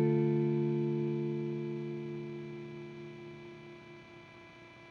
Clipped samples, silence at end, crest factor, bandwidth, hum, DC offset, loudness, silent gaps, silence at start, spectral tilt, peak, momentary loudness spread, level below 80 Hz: under 0.1%; 0 s; 16 dB; 6.4 kHz; 60 Hz at -65 dBFS; under 0.1%; -35 LUFS; none; 0 s; -9.5 dB/octave; -20 dBFS; 22 LU; -74 dBFS